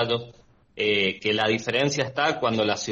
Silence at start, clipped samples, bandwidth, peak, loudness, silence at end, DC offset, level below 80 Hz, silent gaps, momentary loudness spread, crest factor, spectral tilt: 0 s; under 0.1%; 8.4 kHz; -8 dBFS; -24 LUFS; 0 s; under 0.1%; -60 dBFS; none; 4 LU; 16 dB; -4 dB/octave